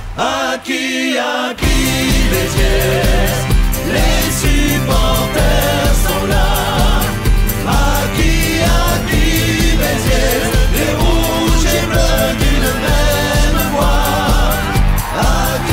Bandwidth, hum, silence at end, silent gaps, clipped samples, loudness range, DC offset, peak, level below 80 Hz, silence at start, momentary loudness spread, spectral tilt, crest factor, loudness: 16 kHz; none; 0 s; none; under 0.1%; 1 LU; under 0.1%; -2 dBFS; -16 dBFS; 0 s; 2 LU; -4.5 dB/octave; 10 dB; -14 LUFS